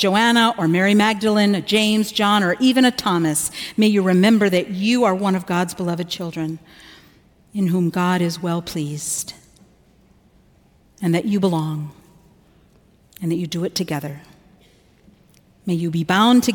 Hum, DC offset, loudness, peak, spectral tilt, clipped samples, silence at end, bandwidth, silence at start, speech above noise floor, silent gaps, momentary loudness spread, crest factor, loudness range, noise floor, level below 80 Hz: none; under 0.1%; -19 LUFS; -4 dBFS; -5 dB/octave; under 0.1%; 0 s; 18 kHz; 0 s; 36 dB; none; 12 LU; 16 dB; 10 LU; -55 dBFS; -58 dBFS